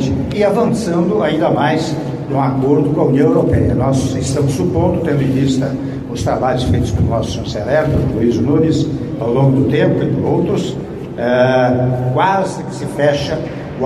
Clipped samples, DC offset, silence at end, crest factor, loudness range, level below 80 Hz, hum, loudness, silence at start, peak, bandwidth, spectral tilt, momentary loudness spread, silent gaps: under 0.1%; under 0.1%; 0 s; 14 dB; 2 LU; -34 dBFS; none; -15 LUFS; 0 s; -2 dBFS; 12.5 kHz; -7 dB/octave; 8 LU; none